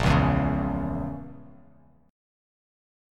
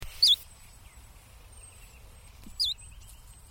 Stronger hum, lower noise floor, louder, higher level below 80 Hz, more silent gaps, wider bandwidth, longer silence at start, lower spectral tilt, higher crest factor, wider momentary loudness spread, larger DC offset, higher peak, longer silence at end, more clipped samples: neither; first, -57 dBFS vs -51 dBFS; about the same, -26 LUFS vs -25 LUFS; first, -38 dBFS vs -52 dBFS; neither; second, 11 kHz vs 17.5 kHz; about the same, 0 s vs 0 s; first, -7.5 dB/octave vs 0 dB/octave; about the same, 20 dB vs 22 dB; second, 17 LU vs 29 LU; neither; first, -8 dBFS vs -12 dBFS; first, 1 s vs 0.2 s; neither